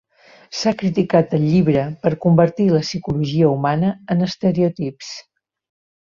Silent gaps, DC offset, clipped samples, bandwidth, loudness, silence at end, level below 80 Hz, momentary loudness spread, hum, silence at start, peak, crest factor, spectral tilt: none; under 0.1%; under 0.1%; 7.2 kHz; -18 LUFS; 0.8 s; -50 dBFS; 12 LU; none; 0.5 s; -2 dBFS; 16 dB; -7 dB/octave